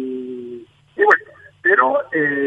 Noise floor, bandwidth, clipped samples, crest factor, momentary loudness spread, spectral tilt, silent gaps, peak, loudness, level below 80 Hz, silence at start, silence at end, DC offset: -37 dBFS; 8.2 kHz; under 0.1%; 18 dB; 20 LU; -6.5 dB/octave; none; 0 dBFS; -16 LUFS; -68 dBFS; 0 s; 0 s; under 0.1%